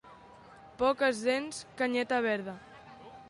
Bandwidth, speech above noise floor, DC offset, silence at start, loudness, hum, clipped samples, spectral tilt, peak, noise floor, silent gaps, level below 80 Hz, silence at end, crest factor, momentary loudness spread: 11.5 kHz; 23 dB; under 0.1%; 0.05 s; -31 LUFS; none; under 0.1%; -3.5 dB/octave; -14 dBFS; -54 dBFS; none; -68 dBFS; 0 s; 18 dB; 22 LU